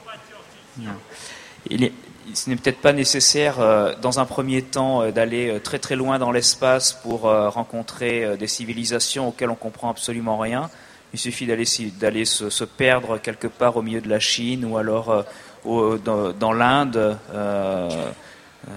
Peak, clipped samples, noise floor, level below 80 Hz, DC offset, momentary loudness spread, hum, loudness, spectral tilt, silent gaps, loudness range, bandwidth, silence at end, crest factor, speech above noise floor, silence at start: 0 dBFS; under 0.1%; -45 dBFS; -56 dBFS; under 0.1%; 14 LU; none; -21 LUFS; -3 dB/octave; none; 5 LU; 15.5 kHz; 0 s; 22 dB; 23 dB; 0.05 s